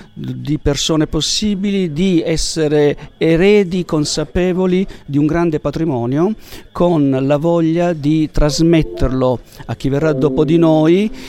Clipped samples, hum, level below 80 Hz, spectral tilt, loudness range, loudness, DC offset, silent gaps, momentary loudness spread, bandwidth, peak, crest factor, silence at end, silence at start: under 0.1%; none; -30 dBFS; -6 dB/octave; 2 LU; -15 LUFS; under 0.1%; none; 7 LU; 14 kHz; 0 dBFS; 14 dB; 0 s; 0 s